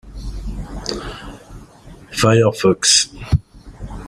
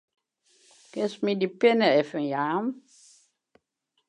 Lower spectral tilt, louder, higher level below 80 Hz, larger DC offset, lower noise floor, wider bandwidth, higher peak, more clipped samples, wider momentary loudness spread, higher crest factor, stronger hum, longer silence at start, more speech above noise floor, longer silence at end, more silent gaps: second, -3.5 dB/octave vs -6 dB/octave; first, -16 LUFS vs -25 LUFS; first, -32 dBFS vs -84 dBFS; neither; second, -41 dBFS vs -77 dBFS; first, 16 kHz vs 10.5 kHz; first, 0 dBFS vs -8 dBFS; neither; first, 22 LU vs 13 LU; about the same, 20 dB vs 20 dB; neither; second, 0.05 s vs 0.95 s; second, 26 dB vs 52 dB; second, 0 s vs 1.3 s; neither